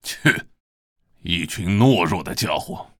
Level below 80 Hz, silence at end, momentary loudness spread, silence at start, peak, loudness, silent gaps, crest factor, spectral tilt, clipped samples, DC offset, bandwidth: -48 dBFS; 0.15 s; 10 LU; 0.05 s; -2 dBFS; -20 LUFS; 0.60-0.96 s; 20 dB; -5 dB/octave; under 0.1%; under 0.1%; 19 kHz